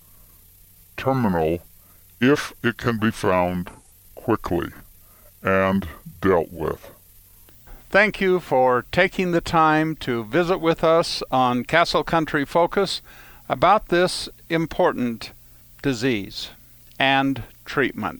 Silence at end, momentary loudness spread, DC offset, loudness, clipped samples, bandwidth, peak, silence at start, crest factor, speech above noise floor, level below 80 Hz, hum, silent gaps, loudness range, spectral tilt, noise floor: 0 s; 12 LU; under 0.1%; -21 LUFS; under 0.1%; over 20 kHz; -2 dBFS; 0.95 s; 20 dB; 30 dB; -46 dBFS; none; none; 5 LU; -5.5 dB/octave; -51 dBFS